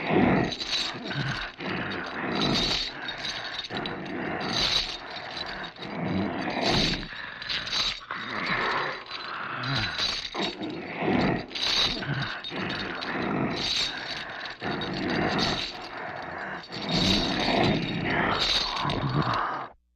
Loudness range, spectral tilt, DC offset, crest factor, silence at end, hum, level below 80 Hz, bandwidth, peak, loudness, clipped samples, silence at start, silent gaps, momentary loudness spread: 4 LU; -4 dB/octave; under 0.1%; 18 dB; 0.25 s; none; -48 dBFS; 14.5 kHz; -10 dBFS; -28 LUFS; under 0.1%; 0 s; none; 11 LU